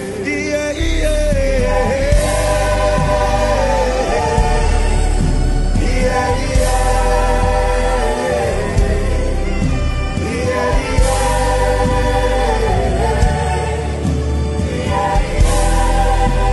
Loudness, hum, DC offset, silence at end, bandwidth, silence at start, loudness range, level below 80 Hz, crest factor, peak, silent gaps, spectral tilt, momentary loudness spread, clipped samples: -16 LUFS; none; under 0.1%; 0 s; 12 kHz; 0 s; 2 LU; -18 dBFS; 14 dB; 0 dBFS; none; -5.5 dB/octave; 4 LU; under 0.1%